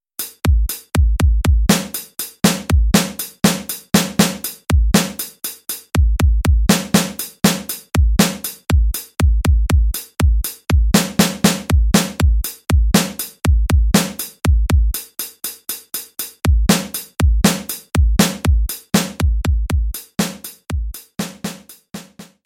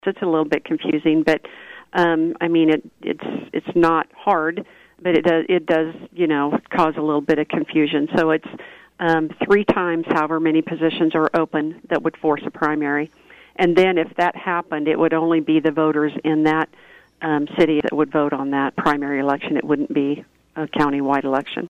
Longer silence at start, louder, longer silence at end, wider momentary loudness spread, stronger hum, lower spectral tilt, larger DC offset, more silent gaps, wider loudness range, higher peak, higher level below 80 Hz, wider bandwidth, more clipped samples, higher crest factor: first, 0.2 s vs 0.05 s; about the same, -18 LUFS vs -20 LUFS; first, 0.2 s vs 0 s; first, 11 LU vs 8 LU; neither; second, -4.5 dB/octave vs -7 dB/octave; neither; neither; about the same, 3 LU vs 1 LU; first, 0 dBFS vs -4 dBFS; first, -20 dBFS vs -56 dBFS; first, 17 kHz vs 7.6 kHz; neither; about the same, 16 dB vs 16 dB